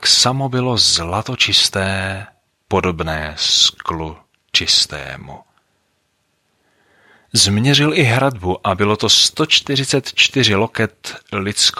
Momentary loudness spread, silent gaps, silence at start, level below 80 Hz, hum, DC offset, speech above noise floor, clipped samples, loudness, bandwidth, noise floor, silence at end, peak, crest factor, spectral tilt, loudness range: 13 LU; none; 0 s; -44 dBFS; none; under 0.1%; 49 dB; under 0.1%; -14 LUFS; 16 kHz; -66 dBFS; 0 s; 0 dBFS; 18 dB; -3 dB/octave; 5 LU